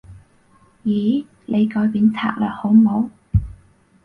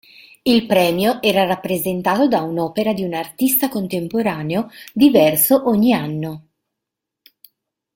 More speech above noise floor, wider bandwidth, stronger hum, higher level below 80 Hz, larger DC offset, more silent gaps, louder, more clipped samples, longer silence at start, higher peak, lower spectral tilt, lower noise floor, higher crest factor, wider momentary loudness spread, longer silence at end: second, 37 dB vs 65 dB; second, 4.4 kHz vs 17 kHz; neither; first, -36 dBFS vs -56 dBFS; neither; neither; about the same, -19 LUFS vs -17 LUFS; neither; second, 0.1 s vs 0.45 s; about the same, -4 dBFS vs -2 dBFS; first, -9 dB/octave vs -4.5 dB/octave; second, -54 dBFS vs -82 dBFS; about the same, 16 dB vs 16 dB; about the same, 9 LU vs 11 LU; second, 0.55 s vs 1.55 s